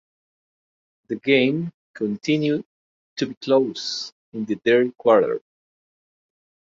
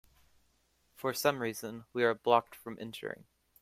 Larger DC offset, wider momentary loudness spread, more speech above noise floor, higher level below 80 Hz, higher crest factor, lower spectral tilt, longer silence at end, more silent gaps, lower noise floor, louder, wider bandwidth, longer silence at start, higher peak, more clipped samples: neither; about the same, 14 LU vs 15 LU; first, over 69 dB vs 40 dB; about the same, -68 dBFS vs -72 dBFS; about the same, 20 dB vs 24 dB; first, -5.5 dB/octave vs -4 dB/octave; first, 1.35 s vs 0.4 s; first, 1.74-1.94 s, 2.65-3.16 s, 3.37-3.41 s, 4.12-4.32 s vs none; first, under -90 dBFS vs -73 dBFS; first, -22 LUFS vs -33 LUFS; second, 7.6 kHz vs 16 kHz; about the same, 1.1 s vs 1 s; first, -4 dBFS vs -10 dBFS; neither